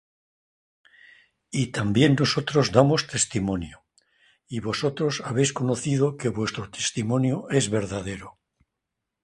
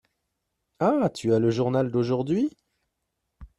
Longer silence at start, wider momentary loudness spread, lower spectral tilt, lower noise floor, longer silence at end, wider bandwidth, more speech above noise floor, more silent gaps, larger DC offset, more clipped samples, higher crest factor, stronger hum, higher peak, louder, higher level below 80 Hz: first, 1.5 s vs 0.8 s; first, 12 LU vs 4 LU; second, -5 dB/octave vs -7.5 dB/octave; about the same, -83 dBFS vs -80 dBFS; first, 0.95 s vs 0.15 s; about the same, 11.5 kHz vs 11.5 kHz; first, 60 dB vs 56 dB; neither; neither; neither; first, 24 dB vs 18 dB; neither; first, -2 dBFS vs -10 dBFS; about the same, -24 LUFS vs -25 LUFS; first, -52 dBFS vs -58 dBFS